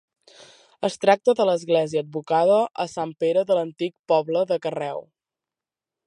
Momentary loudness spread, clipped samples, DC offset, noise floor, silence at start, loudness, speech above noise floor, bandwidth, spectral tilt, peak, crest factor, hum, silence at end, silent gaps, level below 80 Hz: 10 LU; under 0.1%; under 0.1%; -90 dBFS; 0.8 s; -22 LUFS; 68 dB; 11 kHz; -5.5 dB/octave; -2 dBFS; 20 dB; none; 1.05 s; 3.99-4.04 s; -74 dBFS